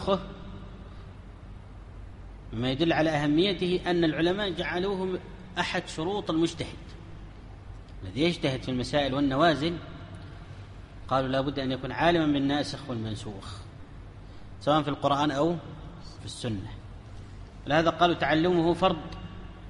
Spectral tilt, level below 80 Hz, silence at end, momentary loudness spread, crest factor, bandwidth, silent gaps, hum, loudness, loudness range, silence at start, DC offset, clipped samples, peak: -6 dB/octave; -46 dBFS; 0 s; 22 LU; 20 dB; 11 kHz; none; none; -27 LUFS; 4 LU; 0 s; under 0.1%; under 0.1%; -8 dBFS